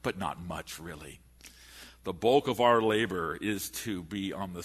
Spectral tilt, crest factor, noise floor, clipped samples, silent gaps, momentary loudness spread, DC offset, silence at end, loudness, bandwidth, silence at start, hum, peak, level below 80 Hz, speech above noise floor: -4.5 dB/octave; 22 dB; -53 dBFS; under 0.1%; none; 24 LU; under 0.1%; 0 s; -30 LUFS; 13.5 kHz; 0.05 s; none; -10 dBFS; -58 dBFS; 23 dB